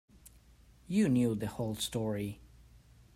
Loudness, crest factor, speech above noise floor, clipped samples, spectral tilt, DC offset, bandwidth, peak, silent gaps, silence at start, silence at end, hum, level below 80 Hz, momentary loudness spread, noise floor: -33 LUFS; 16 dB; 29 dB; under 0.1%; -6 dB/octave; under 0.1%; 16 kHz; -18 dBFS; none; 0.25 s; 0.4 s; none; -60 dBFS; 11 LU; -61 dBFS